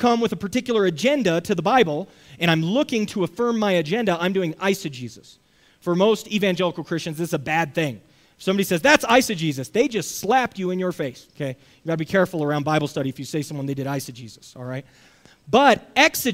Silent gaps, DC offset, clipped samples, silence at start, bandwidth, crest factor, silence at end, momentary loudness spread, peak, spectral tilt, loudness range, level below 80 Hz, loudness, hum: none; under 0.1%; under 0.1%; 0 s; 16 kHz; 22 dB; 0 s; 15 LU; 0 dBFS; -4.5 dB/octave; 4 LU; -58 dBFS; -22 LUFS; none